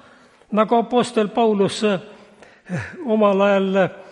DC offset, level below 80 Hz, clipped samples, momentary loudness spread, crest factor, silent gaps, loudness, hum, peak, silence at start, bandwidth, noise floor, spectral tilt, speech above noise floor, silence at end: under 0.1%; -64 dBFS; under 0.1%; 11 LU; 16 dB; none; -19 LUFS; none; -4 dBFS; 0.5 s; 11 kHz; -50 dBFS; -6 dB/octave; 32 dB; 0.1 s